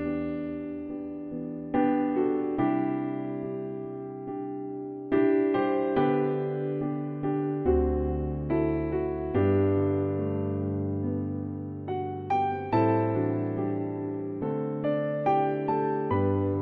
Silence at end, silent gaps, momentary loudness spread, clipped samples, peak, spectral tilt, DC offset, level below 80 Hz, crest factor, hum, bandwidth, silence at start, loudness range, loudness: 0 s; none; 11 LU; under 0.1%; -12 dBFS; -11 dB/octave; under 0.1%; -44 dBFS; 16 dB; none; 4.8 kHz; 0 s; 2 LU; -29 LUFS